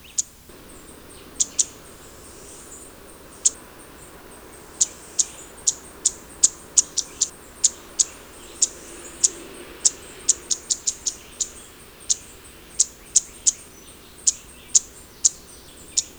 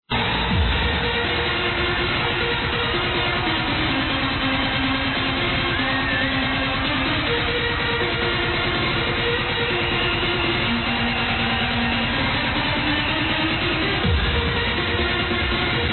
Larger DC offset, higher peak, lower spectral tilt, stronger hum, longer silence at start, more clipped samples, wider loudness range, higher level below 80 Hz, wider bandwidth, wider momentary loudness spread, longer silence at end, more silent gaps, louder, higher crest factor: neither; first, 0 dBFS vs -10 dBFS; second, 1 dB/octave vs -7.5 dB/octave; neither; about the same, 0.15 s vs 0.1 s; neither; first, 5 LU vs 0 LU; second, -54 dBFS vs -32 dBFS; first, over 20 kHz vs 4.4 kHz; first, 23 LU vs 1 LU; first, 0.15 s vs 0 s; neither; about the same, -22 LUFS vs -20 LUFS; first, 26 dB vs 12 dB